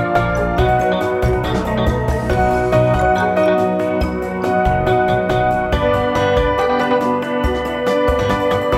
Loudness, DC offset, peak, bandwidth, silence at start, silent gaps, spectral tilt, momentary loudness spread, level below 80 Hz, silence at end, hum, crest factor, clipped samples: -16 LUFS; under 0.1%; -2 dBFS; 15.5 kHz; 0 s; none; -7 dB/octave; 4 LU; -26 dBFS; 0 s; none; 14 dB; under 0.1%